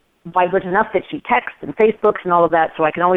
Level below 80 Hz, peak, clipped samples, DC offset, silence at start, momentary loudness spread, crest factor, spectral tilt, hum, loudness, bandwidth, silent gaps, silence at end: -52 dBFS; -2 dBFS; under 0.1%; under 0.1%; 0.25 s; 6 LU; 14 dB; -8.5 dB/octave; none; -17 LUFS; 4 kHz; none; 0 s